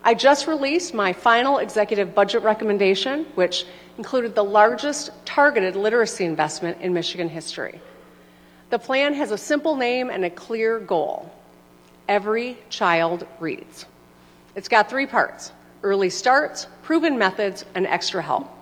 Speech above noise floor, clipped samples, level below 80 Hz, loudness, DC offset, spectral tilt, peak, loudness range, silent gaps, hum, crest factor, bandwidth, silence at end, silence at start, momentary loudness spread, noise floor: 30 dB; under 0.1%; -64 dBFS; -21 LUFS; under 0.1%; -3.5 dB/octave; -2 dBFS; 5 LU; none; 60 Hz at -55 dBFS; 20 dB; 19 kHz; 0 s; 0.05 s; 13 LU; -51 dBFS